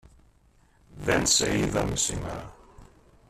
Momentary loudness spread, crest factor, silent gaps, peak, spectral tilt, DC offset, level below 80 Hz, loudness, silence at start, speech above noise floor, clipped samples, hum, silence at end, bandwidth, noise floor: 17 LU; 20 dB; none; -10 dBFS; -3 dB/octave; under 0.1%; -46 dBFS; -25 LUFS; 0.9 s; 35 dB; under 0.1%; none; 0.45 s; 14.5 kHz; -61 dBFS